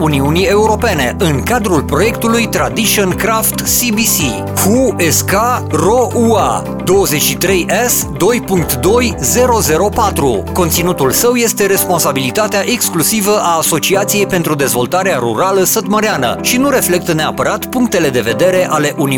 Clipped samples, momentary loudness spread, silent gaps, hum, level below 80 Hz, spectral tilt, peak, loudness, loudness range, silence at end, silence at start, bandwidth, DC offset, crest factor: under 0.1%; 3 LU; none; none; -34 dBFS; -4 dB/octave; 0 dBFS; -12 LUFS; 1 LU; 0 s; 0 s; 19.5 kHz; under 0.1%; 12 dB